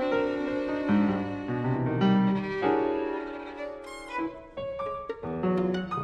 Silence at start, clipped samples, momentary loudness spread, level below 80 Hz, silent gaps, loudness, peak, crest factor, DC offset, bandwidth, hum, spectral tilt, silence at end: 0 s; under 0.1%; 13 LU; -56 dBFS; none; -29 LUFS; -12 dBFS; 16 dB; under 0.1%; 9.6 kHz; none; -8 dB/octave; 0 s